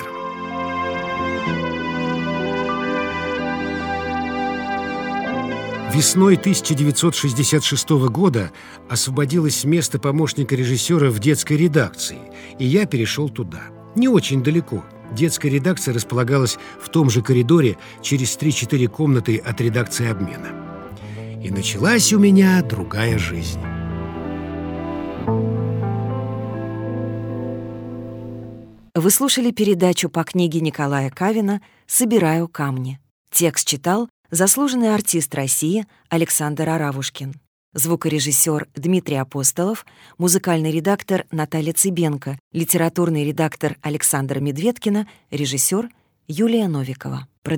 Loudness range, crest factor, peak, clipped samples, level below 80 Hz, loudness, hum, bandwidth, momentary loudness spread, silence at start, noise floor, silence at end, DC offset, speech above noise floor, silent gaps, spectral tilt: 5 LU; 18 dB; 0 dBFS; under 0.1%; -48 dBFS; -19 LUFS; none; over 20 kHz; 12 LU; 0 s; -39 dBFS; 0 s; under 0.1%; 20 dB; 33.11-33.25 s, 34.10-34.24 s, 37.47-37.72 s, 42.40-42.51 s, 47.38-47.42 s; -4.5 dB/octave